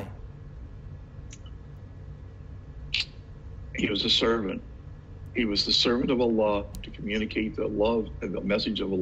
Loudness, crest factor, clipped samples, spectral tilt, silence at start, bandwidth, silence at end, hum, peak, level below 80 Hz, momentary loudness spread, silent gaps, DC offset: -27 LUFS; 20 dB; under 0.1%; -5 dB/octave; 0 s; 8.4 kHz; 0 s; none; -10 dBFS; -44 dBFS; 22 LU; none; under 0.1%